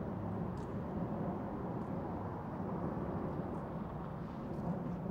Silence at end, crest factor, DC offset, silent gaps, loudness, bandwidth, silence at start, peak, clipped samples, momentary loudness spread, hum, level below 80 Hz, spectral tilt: 0 s; 14 dB; under 0.1%; none; -41 LUFS; 8 kHz; 0 s; -26 dBFS; under 0.1%; 3 LU; none; -56 dBFS; -10 dB/octave